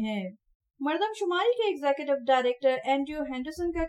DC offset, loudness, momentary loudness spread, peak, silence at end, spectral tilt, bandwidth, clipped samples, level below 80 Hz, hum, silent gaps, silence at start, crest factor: under 0.1%; -28 LUFS; 9 LU; -12 dBFS; 0 s; -5 dB/octave; 12.5 kHz; under 0.1%; -52 dBFS; none; 0.55-0.60 s; 0 s; 16 dB